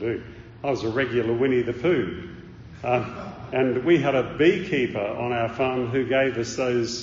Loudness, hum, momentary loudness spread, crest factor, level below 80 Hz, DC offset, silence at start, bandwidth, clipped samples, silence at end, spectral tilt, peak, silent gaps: -24 LUFS; none; 13 LU; 16 dB; -52 dBFS; under 0.1%; 0 s; 7.4 kHz; under 0.1%; 0 s; -5 dB/octave; -6 dBFS; none